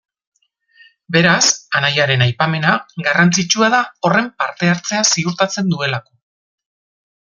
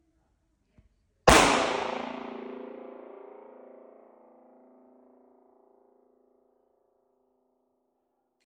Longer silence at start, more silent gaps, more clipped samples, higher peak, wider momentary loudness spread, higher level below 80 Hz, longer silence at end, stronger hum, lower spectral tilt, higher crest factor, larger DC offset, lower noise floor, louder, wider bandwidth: second, 1.1 s vs 1.25 s; neither; neither; about the same, 0 dBFS vs -2 dBFS; second, 5 LU vs 29 LU; second, -58 dBFS vs -46 dBFS; second, 1.35 s vs 5.6 s; neither; about the same, -3.5 dB/octave vs -3 dB/octave; second, 16 dB vs 30 dB; neither; second, -53 dBFS vs -77 dBFS; first, -15 LUFS vs -23 LUFS; second, 7.6 kHz vs 15.5 kHz